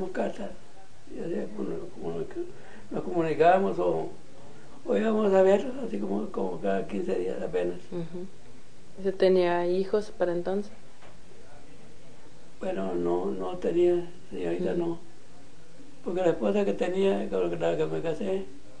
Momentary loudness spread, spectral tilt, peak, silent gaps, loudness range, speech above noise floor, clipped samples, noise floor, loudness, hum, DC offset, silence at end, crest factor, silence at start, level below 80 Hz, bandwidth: 16 LU; -7 dB/octave; -10 dBFS; none; 7 LU; 26 dB; under 0.1%; -53 dBFS; -28 LUFS; none; 2%; 0 s; 20 dB; 0 s; -58 dBFS; 10 kHz